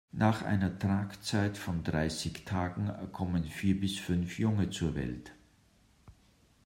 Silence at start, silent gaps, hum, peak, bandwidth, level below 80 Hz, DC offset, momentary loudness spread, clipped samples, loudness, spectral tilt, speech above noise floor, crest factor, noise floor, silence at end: 0.15 s; none; none; -14 dBFS; 16 kHz; -54 dBFS; under 0.1%; 7 LU; under 0.1%; -33 LUFS; -6 dB/octave; 33 dB; 20 dB; -65 dBFS; 0.55 s